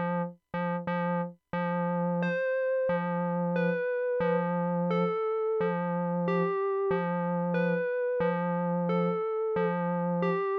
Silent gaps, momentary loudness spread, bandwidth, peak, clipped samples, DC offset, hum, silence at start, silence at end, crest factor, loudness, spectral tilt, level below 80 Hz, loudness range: none; 3 LU; 5 kHz; -14 dBFS; under 0.1%; under 0.1%; none; 0 s; 0 s; 14 dB; -29 LUFS; -10 dB/octave; -70 dBFS; 1 LU